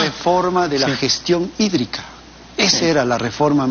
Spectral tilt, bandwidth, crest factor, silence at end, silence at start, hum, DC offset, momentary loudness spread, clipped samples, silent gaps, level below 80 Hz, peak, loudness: -4 dB/octave; 7.2 kHz; 16 dB; 0 s; 0 s; none; under 0.1%; 10 LU; under 0.1%; none; -48 dBFS; -2 dBFS; -17 LUFS